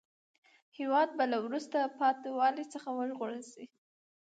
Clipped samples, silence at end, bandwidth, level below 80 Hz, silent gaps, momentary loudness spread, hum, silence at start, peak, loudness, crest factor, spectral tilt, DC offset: under 0.1%; 0.55 s; 9.2 kHz; under -90 dBFS; none; 11 LU; none; 0.8 s; -18 dBFS; -33 LUFS; 18 dB; -4 dB/octave; under 0.1%